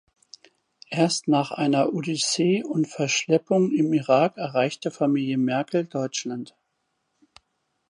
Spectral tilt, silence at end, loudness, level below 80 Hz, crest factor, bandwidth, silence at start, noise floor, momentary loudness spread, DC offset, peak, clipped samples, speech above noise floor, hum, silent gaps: -5 dB/octave; 1.45 s; -23 LUFS; -76 dBFS; 18 dB; 11 kHz; 0.9 s; -75 dBFS; 7 LU; under 0.1%; -6 dBFS; under 0.1%; 52 dB; none; none